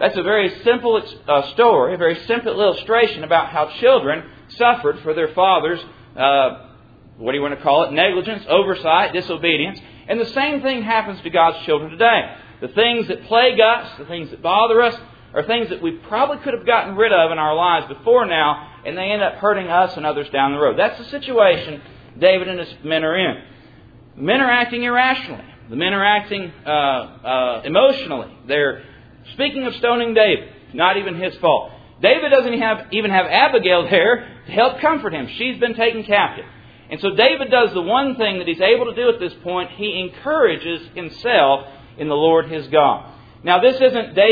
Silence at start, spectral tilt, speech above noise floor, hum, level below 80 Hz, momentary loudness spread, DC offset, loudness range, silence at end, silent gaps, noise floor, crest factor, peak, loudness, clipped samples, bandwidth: 0 s; -7 dB/octave; 28 dB; none; -54 dBFS; 11 LU; under 0.1%; 3 LU; 0 s; none; -45 dBFS; 18 dB; 0 dBFS; -17 LUFS; under 0.1%; 5 kHz